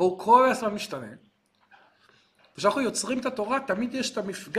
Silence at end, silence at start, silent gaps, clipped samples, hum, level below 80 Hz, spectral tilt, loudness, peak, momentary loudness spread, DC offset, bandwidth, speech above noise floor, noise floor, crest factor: 0 s; 0 s; none; under 0.1%; none; -68 dBFS; -3.5 dB/octave; -25 LUFS; -6 dBFS; 15 LU; under 0.1%; 15 kHz; 37 dB; -62 dBFS; 20 dB